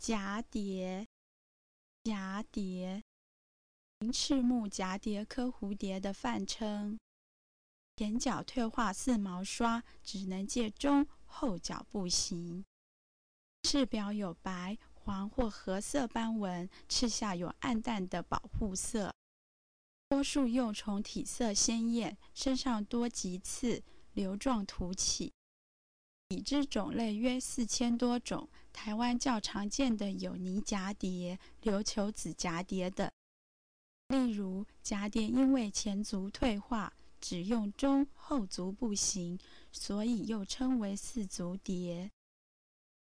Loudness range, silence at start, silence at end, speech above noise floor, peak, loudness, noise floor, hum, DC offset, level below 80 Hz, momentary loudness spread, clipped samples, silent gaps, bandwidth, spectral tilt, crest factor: 4 LU; 0 s; 0.95 s; over 55 dB; -18 dBFS; -36 LUFS; under -90 dBFS; none; 0.1%; -54 dBFS; 10 LU; under 0.1%; 1.06-2.05 s, 3.02-4.01 s, 7.01-7.98 s, 12.67-13.63 s, 19.15-20.11 s, 25.34-26.30 s, 33.13-34.10 s; 10.5 kHz; -4 dB/octave; 18 dB